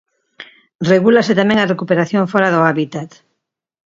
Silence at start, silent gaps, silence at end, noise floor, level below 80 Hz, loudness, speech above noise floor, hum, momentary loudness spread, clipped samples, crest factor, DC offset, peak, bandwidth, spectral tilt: 0.4 s; 0.75-0.79 s; 0.85 s; -75 dBFS; -58 dBFS; -14 LUFS; 61 dB; none; 12 LU; under 0.1%; 16 dB; under 0.1%; 0 dBFS; 7.6 kHz; -6.5 dB/octave